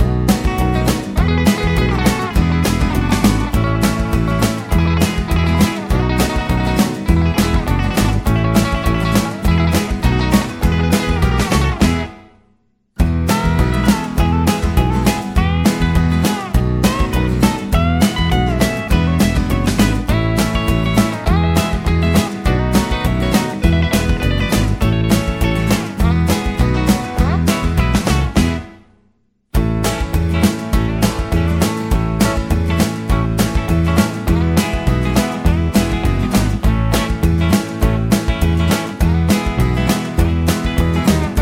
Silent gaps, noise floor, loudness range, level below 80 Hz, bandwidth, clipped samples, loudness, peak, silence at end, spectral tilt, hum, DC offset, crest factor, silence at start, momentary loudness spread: none; -59 dBFS; 2 LU; -20 dBFS; 16.5 kHz; under 0.1%; -16 LUFS; 0 dBFS; 0 s; -6 dB/octave; none; under 0.1%; 14 dB; 0 s; 3 LU